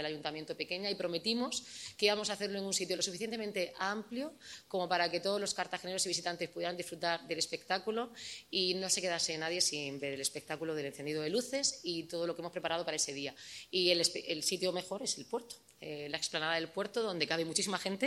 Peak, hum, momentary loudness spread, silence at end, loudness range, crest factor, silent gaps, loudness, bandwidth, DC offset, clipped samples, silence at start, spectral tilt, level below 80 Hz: -14 dBFS; none; 9 LU; 0 s; 2 LU; 22 dB; none; -35 LUFS; 16 kHz; under 0.1%; under 0.1%; 0 s; -2 dB/octave; -78 dBFS